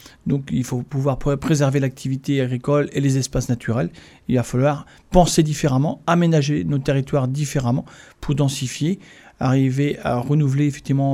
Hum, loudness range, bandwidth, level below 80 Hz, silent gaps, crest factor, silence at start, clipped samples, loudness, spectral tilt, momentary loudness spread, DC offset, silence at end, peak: none; 3 LU; 13.5 kHz; -38 dBFS; none; 18 dB; 0.25 s; under 0.1%; -20 LUFS; -6.5 dB/octave; 7 LU; under 0.1%; 0 s; -2 dBFS